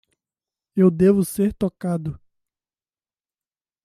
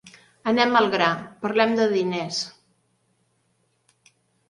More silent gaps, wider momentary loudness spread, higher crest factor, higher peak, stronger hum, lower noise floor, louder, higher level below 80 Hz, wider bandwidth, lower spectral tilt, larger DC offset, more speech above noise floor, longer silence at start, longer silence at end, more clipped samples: neither; about the same, 12 LU vs 10 LU; about the same, 18 dB vs 22 dB; about the same, -6 dBFS vs -4 dBFS; neither; first, under -90 dBFS vs -69 dBFS; about the same, -20 LUFS vs -22 LUFS; first, -52 dBFS vs -70 dBFS; first, 15 kHz vs 11.5 kHz; first, -8 dB/octave vs -4.5 dB/octave; neither; first, over 71 dB vs 47 dB; first, 0.75 s vs 0.05 s; second, 1.7 s vs 2 s; neither